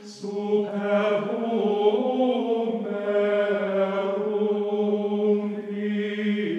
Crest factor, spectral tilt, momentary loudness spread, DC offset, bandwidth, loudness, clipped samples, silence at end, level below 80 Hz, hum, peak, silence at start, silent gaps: 16 dB; -7 dB/octave; 5 LU; under 0.1%; 8.2 kHz; -25 LUFS; under 0.1%; 0 s; -90 dBFS; none; -8 dBFS; 0 s; none